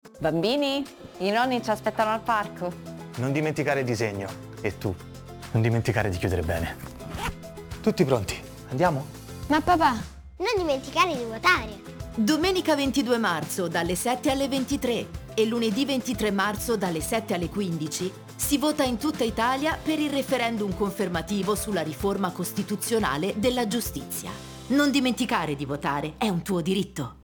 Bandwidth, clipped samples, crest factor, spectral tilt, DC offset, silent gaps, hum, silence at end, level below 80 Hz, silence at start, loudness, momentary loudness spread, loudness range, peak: over 20 kHz; under 0.1%; 20 dB; -5 dB/octave; under 0.1%; none; none; 0.1 s; -46 dBFS; 0.05 s; -26 LUFS; 10 LU; 4 LU; -6 dBFS